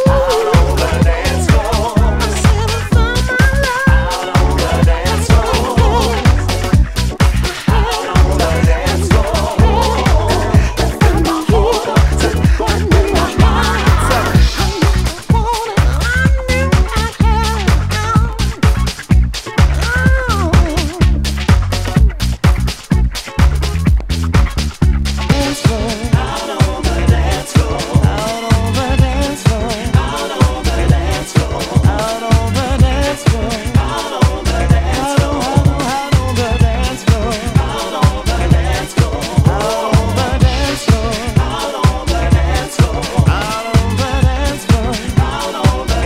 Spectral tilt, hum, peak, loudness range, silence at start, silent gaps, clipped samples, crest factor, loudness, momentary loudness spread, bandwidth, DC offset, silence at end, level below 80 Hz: -5.5 dB/octave; none; 0 dBFS; 2 LU; 0 s; none; 0.2%; 12 dB; -14 LUFS; 4 LU; 16 kHz; under 0.1%; 0 s; -16 dBFS